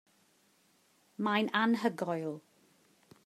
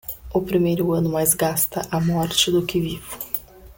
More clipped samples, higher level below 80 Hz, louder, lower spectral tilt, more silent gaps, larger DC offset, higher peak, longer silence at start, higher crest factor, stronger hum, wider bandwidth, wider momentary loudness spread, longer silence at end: neither; second, -90 dBFS vs -46 dBFS; second, -32 LUFS vs -21 LUFS; first, -5.5 dB/octave vs -4 dB/octave; neither; neither; second, -14 dBFS vs -4 dBFS; first, 1.2 s vs 0.05 s; about the same, 22 dB vs 18 dB; neither; second, 14 kHz vs 17 kHz; first, 16 LU vs 9 LU; first, 0.85 s vs 0.05 s